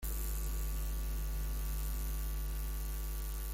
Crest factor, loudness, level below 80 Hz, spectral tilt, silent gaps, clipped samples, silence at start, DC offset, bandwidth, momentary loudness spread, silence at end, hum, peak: 16 dB; -40 LUFS; -38 dBFS; -4.5 dB/octave; none; under 0.1%; 0 s; under 0.1%; 17 kHz; 2 LU; 0 s; none; -22 dBFS